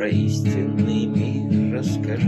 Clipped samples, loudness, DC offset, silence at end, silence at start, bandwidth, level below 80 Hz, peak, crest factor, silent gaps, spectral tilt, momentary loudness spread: under 0.1%; -22 LUFS; under 0.1%; 0 s; 0 s; 12 kHz; -58 dBFS; -6 dBFS; 14 dB; none; -7.5 dB/octave; 2 LU